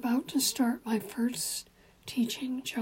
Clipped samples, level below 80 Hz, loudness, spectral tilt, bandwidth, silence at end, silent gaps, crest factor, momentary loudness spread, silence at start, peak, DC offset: under 0.1%; -68 dBFS; -31 LUFS; -2.5 dB/octave; 16.5 kHz; 0 s; none; 16 dB; 9 LU; 0 s; -16 dBFS; under 0.1%